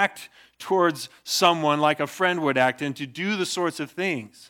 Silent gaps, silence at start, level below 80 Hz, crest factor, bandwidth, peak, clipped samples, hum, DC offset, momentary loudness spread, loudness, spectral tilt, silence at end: none; 0 s; -78 dBFS; 20 dB; 19 kHz; -4 dBFS; under 0.1%; none; under 0.1%; 10 LU; -23 LUFS; -3.5 dB/octave; 0.2 s